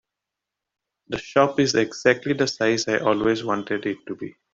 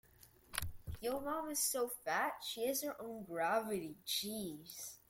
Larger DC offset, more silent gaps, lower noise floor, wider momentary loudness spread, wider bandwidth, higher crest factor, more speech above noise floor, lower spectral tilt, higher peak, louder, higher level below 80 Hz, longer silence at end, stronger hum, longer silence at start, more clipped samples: neither; neither; first, -85 dBFS vs -65 dBFS; about the same, 12 LU vs 10 LU; second, 7.8 kHz vs 16.5 kHz; about the same, 20 dB vs 24 dB; first, 63 dB vs 24 dB; first, -4.5 dB/octave vs -2.5 dB/octave; first, -4 dBFS vs -16 dBFS; first, -22 LUFS vs -40 LUFS; about the same, -58 dBFS vs -62 dBFS; about the same, 0.2 s vs 0.1 s; neither; first, 1.1 s vs 0.25 s; neither